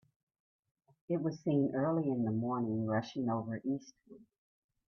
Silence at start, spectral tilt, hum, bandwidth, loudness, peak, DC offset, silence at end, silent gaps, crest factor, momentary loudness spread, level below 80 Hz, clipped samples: 1.1 s; -8.5 dB/octave; none; 6.6 kHz; -35 LUFS; -20 dBFS; under 0.1%; 0.7 s; none; 16 dB; 6 LU; -76 dBFS; under 0.1%